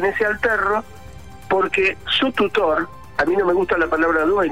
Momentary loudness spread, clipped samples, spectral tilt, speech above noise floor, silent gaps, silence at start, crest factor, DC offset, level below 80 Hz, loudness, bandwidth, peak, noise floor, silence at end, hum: 5 LU; under 0.1%; -5 dB/octave; 20 dB; none; 0 s; 12 dB; 0.9%; -46 dBFS; -19 LUFS; 15.5 kHz; -8 dBFS; -39 dBFS; 0 s; none